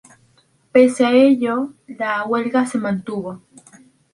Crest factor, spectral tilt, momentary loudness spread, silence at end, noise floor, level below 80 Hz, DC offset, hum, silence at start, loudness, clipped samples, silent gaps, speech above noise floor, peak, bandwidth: 16 dB; -5.5 dB/octave; 15 LU; 0.75 s; -58 dBFS; -62 dBFS; under 0.1%; none; 0.75 s; -18 LUFS; under 0.1%; none; 41 dB; -2 dBFS; 11.5 kHz